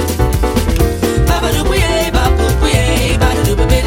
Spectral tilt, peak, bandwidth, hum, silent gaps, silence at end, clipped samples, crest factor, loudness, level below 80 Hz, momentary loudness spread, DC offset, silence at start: -5 dB/octave; 0 dBFS; 17 kHz; none; none; 0 s; under 0.1%; 12 dB; -13 LUFS; -16 dBFS; 2 LU; under 0.1%; 0 s